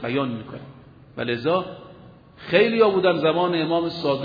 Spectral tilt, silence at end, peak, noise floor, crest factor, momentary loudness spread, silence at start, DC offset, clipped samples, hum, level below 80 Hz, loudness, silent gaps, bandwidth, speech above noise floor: -8 dB/octave; 0 s; -4 dBFS; -46 dBFS; 18 dB; 22 LU; 0 s; under 0.1%; under 0.1%; none; -60 dBFS; -21 LUFS; none; 5 kHz; 25 dB